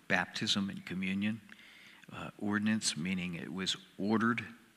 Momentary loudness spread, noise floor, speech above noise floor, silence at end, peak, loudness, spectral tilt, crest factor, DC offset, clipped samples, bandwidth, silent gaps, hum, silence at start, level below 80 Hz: 17 LU; -57 dBFS; 22 dB; 0.2 s; -12 dBFS; -34 LUFS; -4 dB/octave; 22 dB; under 0.1%; under 0.1%; 14.5 kHz; none; none; 0.1 s; -74 dBFS